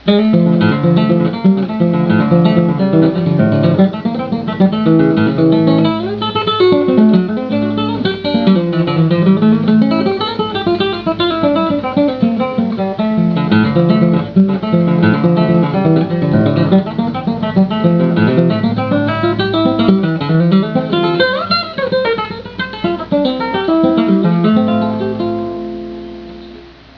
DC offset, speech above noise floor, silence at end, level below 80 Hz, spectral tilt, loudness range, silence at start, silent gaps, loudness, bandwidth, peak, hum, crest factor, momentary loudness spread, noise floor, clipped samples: under 0.1%; 25 dB; 0.25 s; -46 dBFS; -9.5 dB/octave; 3 LU; 0.05 s; none; -13 LUFS; 5.4 kHz; 0 dBFS; none; 12 dB; 7 LU; -35 dBFS; under 0.1%